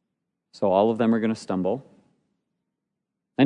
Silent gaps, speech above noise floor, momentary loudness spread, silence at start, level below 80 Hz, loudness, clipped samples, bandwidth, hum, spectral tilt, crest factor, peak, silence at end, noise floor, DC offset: none; 60 dB; 10 LU; 0.55 s; -76 dBFS; -24 LUFS; under 0.1%; 10 kHz; none; -7 dB/octave; 18 dB; -8 dBFS; 0 s; -83 dBFS; under 0.1%